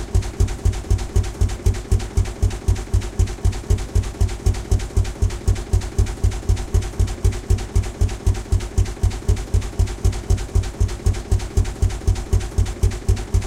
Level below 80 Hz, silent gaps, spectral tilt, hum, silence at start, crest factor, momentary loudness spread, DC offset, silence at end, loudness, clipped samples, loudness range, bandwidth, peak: -22 dBFS; none; -6 dB/octave; none; 0 s; 14 dB; 3 LU; under 0.1%; 0 s; -22 LUFS; under 0.1%; 0 LU; 14 kHz; -6 dBFS